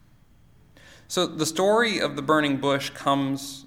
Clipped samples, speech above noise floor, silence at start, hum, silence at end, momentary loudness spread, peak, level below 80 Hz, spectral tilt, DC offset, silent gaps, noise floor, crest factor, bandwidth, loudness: under 0.1%; 31 dB; 1.1 s; none; 0.05 s; 6 LU; -6 dBFS; -62 dBFS; -4 dB/octave; under 0.1%; none; -55 dBFS; 18 dB; 16.5 kHz; -24 LUFS